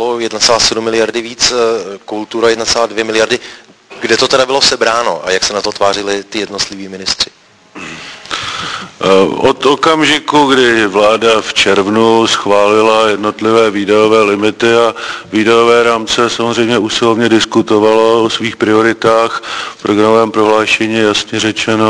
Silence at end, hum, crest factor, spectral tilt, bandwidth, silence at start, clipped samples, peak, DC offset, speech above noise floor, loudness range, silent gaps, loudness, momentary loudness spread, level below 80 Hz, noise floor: 0 s; none; 12 dB; -3 dB/octave; 11 kHz; 0 s; 0.3%; 0 dBFS; under 0.1%; 21 dB; 5 LU; none; -11 LUFS; 10 LU; -46 dBFS; -32 dBFS